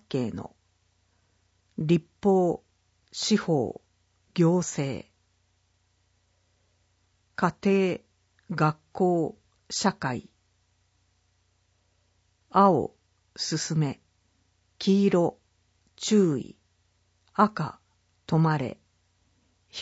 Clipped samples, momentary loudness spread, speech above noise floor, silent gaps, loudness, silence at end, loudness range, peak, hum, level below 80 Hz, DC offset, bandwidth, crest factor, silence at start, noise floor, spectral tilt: under 0.1%; 16 LU; 45 dB; none; -26 LUFS; 0 s; 5 LU; -8 dBFS; 60 Hz at -65 dBFS; -66 dBFS; under 0.1%; 8 kHz; 22 dB; 0.1 s; -70 dBFS; -6 dB/octave